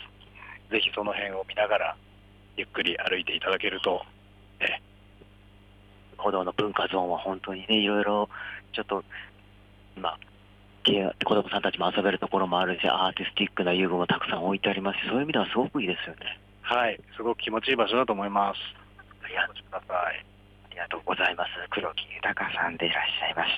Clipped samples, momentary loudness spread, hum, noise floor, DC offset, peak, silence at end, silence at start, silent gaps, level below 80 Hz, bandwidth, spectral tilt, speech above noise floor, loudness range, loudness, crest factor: under 0.1%; 12 LU; 50 Hz at -55 dBFS; -54 dBFS; under 0.1%; -10 dBFS; 0 s; 0 s; none; -60 dBFS; 10.5 kHz; -6 dB/octave; 26 dB; 5 LU; -28 LUFS; 20 dB